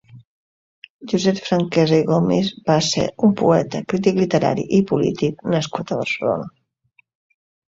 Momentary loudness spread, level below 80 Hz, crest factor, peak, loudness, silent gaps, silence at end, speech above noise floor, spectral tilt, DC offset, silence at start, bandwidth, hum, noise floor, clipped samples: 7 LU; -54 dBFS; 16 dB; -2 dBFS; -19 LUFS; 0.25-0.82 s, 0.90-0.99 s; 1.25 s; 43 dB; -6 dB/octave; under 0.1%; 0.15 s; 7.8 kHz; none; -61 dBFS; under 0.1%